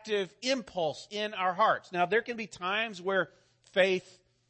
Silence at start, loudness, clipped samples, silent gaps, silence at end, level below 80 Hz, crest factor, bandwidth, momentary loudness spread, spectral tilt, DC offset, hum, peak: 0.05 s; -31 LUFS; under 0.1%; none; 0.5 s; -72 dBFS; 18 dB; 8.8 kHz; 8 LU; -4 dB/octave; under 0.1%; none; -14 dBFS